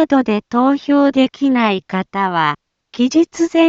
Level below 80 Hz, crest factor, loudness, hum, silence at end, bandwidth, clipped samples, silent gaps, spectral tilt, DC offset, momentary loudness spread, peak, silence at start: -58 dBFS; 14 dB; -16 LUFS; none; 0 s; 7.8 kHz; under 0.1%; none; -5.5 dB/octave; under 0.1%; 6 LU; -2 dBFS; 0 s